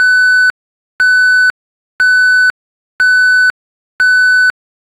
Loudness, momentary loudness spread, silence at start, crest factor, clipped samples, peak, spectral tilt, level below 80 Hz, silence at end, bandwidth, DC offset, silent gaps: -9 LUFS; 6 LU; 0 s; 8 dB; under 0.1%; -4 dBFS; 2.5 dB/octave; -62 dBFS; 0.5 s; 14 kHz; under 0.1%; 0.50-0.99 s, 1.50-1.99 s, 2.50-2.99 s, 3.50-3.99 s